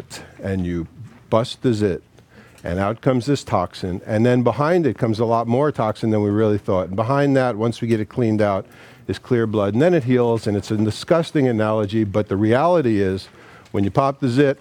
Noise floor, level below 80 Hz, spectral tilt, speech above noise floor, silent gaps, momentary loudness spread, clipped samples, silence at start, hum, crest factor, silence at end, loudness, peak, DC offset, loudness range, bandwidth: -47 dBFS; -54 dBFS; -7.5 dB/octave; 29 dB; none; 10 LU; under 0.1%; 0 s; none; 18 dB; 0.05 s; -20 LUFS; 0 dBFS; under 0.1%; 3 LU; 13 kHz